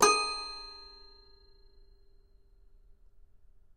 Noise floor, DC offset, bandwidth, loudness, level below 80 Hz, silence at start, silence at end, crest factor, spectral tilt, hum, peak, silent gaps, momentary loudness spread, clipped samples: -60 dBFS; under 0.1%; 15 kHz; -31 LUFS; -58 dBFS; 0 s; 2.8 s; 28 dB; 0 dB/octave; none; -8 dBFS; none; 27 LU; under 0.1%